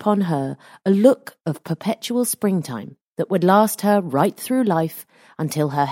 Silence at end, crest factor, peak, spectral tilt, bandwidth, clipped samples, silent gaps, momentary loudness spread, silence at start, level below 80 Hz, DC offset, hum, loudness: 0 s; 18 dB; -2 dBFS; -6 dB/octave; 17 kHz; under 0.1%; 3.01-3.16 s; 14 LU; 0 s; -66 dBFS; under 0.1%; none; -20 LUFS